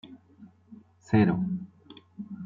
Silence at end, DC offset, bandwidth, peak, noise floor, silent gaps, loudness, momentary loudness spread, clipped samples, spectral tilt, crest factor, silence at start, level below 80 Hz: 0 s; under 0.1%; 7.4 kHz; -10 dBFS; -54 dBFS; none; -27 LUFS; 25 LU; under 0.1%; -9 dB/octave; 20 dB; 0.05 s; -62 dBFS